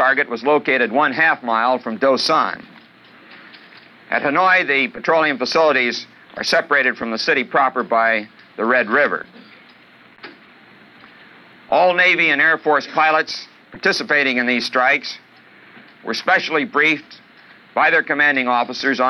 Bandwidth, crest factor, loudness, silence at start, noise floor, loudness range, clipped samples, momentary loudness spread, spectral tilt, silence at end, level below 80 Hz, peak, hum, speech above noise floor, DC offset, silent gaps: 12 kHz; 16 dB; -16 LUFS; 0 s; -47 dBFS; 4 LU; under 0.1%; 10 LU; -3.5 dB/octave; 0 s; -66 dBFS; -4 dBFS; none; 30 dB; under 0.1%; none